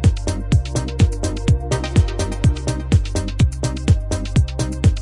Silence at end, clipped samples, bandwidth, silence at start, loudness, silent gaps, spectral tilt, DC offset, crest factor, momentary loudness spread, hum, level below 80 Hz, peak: 0 s; under 0.1%; 11.5 kHz; 0 s; -20 LUFS; none; -6 dB/octave; under 0.1%; 14 dB; 4 LU; none; -24 dBFS; -2 dBFS